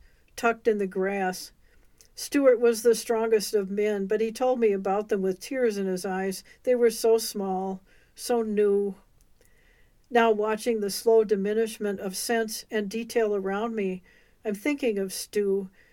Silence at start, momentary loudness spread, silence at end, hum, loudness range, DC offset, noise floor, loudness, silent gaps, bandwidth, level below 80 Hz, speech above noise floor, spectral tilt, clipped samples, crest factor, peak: 0.35 s; 10 LU; 0.25 s; none; 4 LU; under 0.1%; -59 dBFS; -26 LUFS; none; 17 kHz; -62 dBFS; 34 dB; -4.5 dB/octave; under 0.1%; 18 dB; -8 dBFS